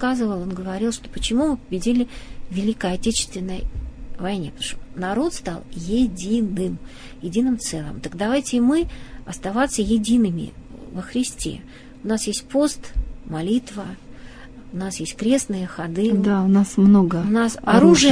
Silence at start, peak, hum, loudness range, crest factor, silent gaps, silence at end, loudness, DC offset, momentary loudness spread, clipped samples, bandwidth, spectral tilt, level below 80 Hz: 0 s; -2 dBFS; none; 7 LU; 20 dB; none; 0 s; -21 LUFS; under 0.1%; 17 LU; under 0.1%; 11 kHz; -5 dB/octave; -38 dBFS